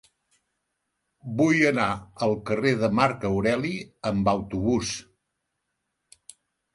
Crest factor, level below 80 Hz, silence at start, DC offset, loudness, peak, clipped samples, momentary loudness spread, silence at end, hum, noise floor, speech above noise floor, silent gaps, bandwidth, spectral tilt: 22 dB; -52 dBFS; 1.25 s; under 0.1%; -25 LUFS; -6 dBFS; under 0.1%; 11 LU; 1.75 s; none; -80 dBFS; 56 dB; none; 11.5 kHz; -5.5 dB/octave